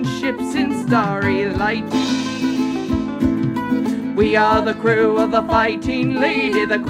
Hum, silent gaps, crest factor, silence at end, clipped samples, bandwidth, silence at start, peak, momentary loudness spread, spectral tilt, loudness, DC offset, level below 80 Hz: none; none; 14 dB; 0 s; under 0.1%; 14 kHz; 0 s; -4 dBFS; 5 LU; -6 dB/octave; -18 LUFS; under 0.1%; -40 dBFS